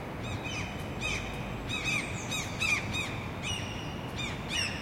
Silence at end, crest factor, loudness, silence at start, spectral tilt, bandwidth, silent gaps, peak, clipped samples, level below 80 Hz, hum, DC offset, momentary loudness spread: 0 s; 16 dB; -33 LUFS; 0 s; -3.5 dB/octave; 16.5 kHz; none; -18 dBFS; under 0.1%; -48 dBFS; none; under 0.1%; 8 LU